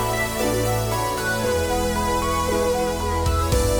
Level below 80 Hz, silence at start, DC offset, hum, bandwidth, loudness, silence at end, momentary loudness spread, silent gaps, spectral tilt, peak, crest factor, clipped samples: -30 dBFS; 0 s; under 0.1%; none; over 20 kHz; -22 LUFS; 0 s; 2 LU; none; -4.5 dB/octave; -6 dBFS; 16 dB; under 0.1%